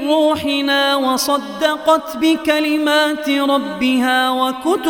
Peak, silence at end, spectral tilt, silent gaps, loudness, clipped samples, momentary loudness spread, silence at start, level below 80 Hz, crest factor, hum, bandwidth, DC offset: -2 dBFS; 0 s; -2.5 dB/octave; none; -16 LUFS; under 0.1%; 3 LU; 0 s; -54 dBFS; 14 dB; none; 19 kHz; under 0.1%